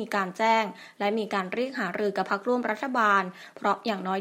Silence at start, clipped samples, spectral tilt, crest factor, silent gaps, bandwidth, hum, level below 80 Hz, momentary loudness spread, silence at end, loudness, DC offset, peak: 0 s; under 0.1%; -5 dB/octave; 18 dB; none; 16 kHz; none; -80 dBFS; 7 LU; 0 s; -27 LUFS; under 0.1%; -10 dBFS